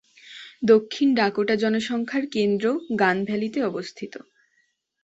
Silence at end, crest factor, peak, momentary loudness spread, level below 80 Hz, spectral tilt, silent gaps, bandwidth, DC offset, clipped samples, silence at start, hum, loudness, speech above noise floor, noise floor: 0.85 s; 18 dB; -4 dBFS; 18 LU; -68 dBFS; -5.5 dB/octave; none; 8 kHz; under 0.1%; under 0.1%; 0.25 s; none; -23 LUFS; 47 dB; -69 dBFS